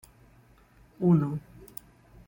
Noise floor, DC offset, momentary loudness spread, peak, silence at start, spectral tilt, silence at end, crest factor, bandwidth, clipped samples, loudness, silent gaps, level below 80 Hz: -58 dBFS; under 0.1%; 21 LU; -12 dBFS; 1 s; -10 dB/octave; 0.9 s; 18 dB; 16.5 kHz; under 0.1%; -27 LUFS; none; -60 dBFS